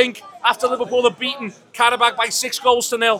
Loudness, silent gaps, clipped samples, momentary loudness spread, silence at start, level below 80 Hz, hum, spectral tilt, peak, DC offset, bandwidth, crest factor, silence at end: -18 LUFS; none; under 0.1%; 8 LU; 0 s; -64 dBFS; none; -1 dB/octave; 0 dBFS; under 0.1%; 17.5 kHz; 18 dB; 0 s